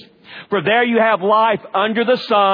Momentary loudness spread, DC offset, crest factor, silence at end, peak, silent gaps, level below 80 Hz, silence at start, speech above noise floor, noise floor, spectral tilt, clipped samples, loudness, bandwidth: 5 LU; under 0.1%; 14 dB; 0 s; -2 dBFS; none; -70 dBFS; 0.3 s; 24 dB; -39 dBFS; -7 dB/octave; under 0.1%; -16 LUFS; 5.2 kHz